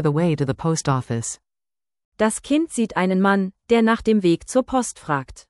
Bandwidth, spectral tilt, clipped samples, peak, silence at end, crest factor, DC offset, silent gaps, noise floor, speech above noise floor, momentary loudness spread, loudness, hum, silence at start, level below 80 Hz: 12 kHz; -5.5 dB/octave; under 0.1%; -6 dBFS; 0.1 s; 14 dB; under 0.1%; 2.05-2.12 s; under -90 dBFS; over 70 dB; 8 LU; -21 LUFS; none; 0 s; -50 dBFS